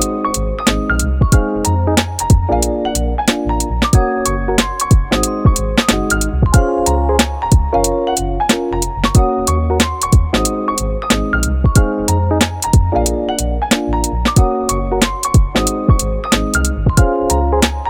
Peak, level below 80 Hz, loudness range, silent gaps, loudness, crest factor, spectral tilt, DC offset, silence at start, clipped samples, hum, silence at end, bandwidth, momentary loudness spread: 0 dBFS; -18 dBFS; 1 LU; none; -15 LUFS; 14 dB; -5 dB/octave; under 0.1%; 0 s; under 0.1%; none; 0 s; 17.5 kHz; 4 LU